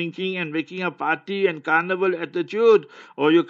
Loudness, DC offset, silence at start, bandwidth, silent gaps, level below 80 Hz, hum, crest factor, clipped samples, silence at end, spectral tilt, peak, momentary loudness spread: -22 LUFS; under 0.1%; 0 s; 7.2 kHz; none; -82 dBFS; none; 16 dB; under 0.1%; 0 s; -7 dB/octave; -4 dBFS; 9 LU